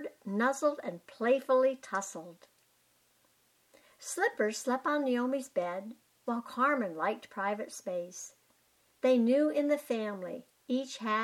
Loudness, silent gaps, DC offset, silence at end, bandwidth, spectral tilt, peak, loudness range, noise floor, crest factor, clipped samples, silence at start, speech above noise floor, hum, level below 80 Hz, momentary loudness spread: -32 LUFS; none; under 0.1%; 0 s; 15.5 kHz; -4 dB/octave; -16 dBFS; 3 LU; -70 dBFS; 16 dB; under 0.1%; 0 s; 38 dB; none; -88 dBFS; 16 LU